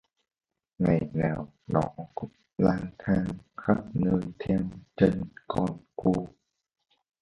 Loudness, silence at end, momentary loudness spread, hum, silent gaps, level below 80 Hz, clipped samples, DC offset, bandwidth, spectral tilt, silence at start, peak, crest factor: -29 LUFS; 0.95 s; 11 LU; none; none; -52 dBFS; under 0.1%; under 0.1%; 8.2 kHz; -9.5 dB/octave; 0.8 s; -6 dBFS; 22 dB